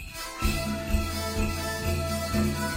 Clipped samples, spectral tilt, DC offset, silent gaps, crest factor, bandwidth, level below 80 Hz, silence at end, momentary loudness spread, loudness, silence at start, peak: under 0.1%; -4.5 dB/octave; under 0.1%; none; 16 dB; 16 kHz; -34 dBFS; 0 s; 3 LU; -29 LUFS; 0 s; -14 dBFS